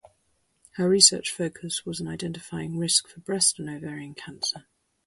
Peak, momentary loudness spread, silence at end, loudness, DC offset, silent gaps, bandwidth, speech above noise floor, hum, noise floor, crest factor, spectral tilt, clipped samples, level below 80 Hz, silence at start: -2 dBFS; 20 LU; 0.45 s; -24 LUFS; under 0.1%; none; 12 kHz; 44 dB; none; -70 dBFS; 26 dB; -2.5 dB/octave; under 0.1%; -62 dBFS; 0.75 s